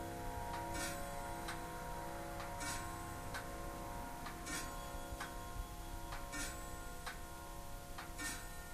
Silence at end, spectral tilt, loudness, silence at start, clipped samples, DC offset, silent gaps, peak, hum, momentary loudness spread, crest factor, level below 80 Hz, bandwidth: 0 s; -3.5 dB/octave; -46 LUFS; 0 s; under 0.1%; under 0.1%; none; -30 dBFS; none; 6 LU; 16 dB; -52 dBFS; 15.5 kHz